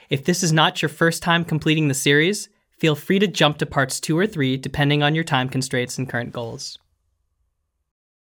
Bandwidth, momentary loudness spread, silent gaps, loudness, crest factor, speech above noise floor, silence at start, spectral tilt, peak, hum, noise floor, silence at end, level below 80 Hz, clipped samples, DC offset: over 20 kHz; 11 LU; none; -20 LUFS; 18 dB; 52 dB; 0.1 s; -4.5 dB/octave; -2 dBFS; none; -72 dBFS; 1.55 s; -52 dBFS; under 0.1%; under 0.1%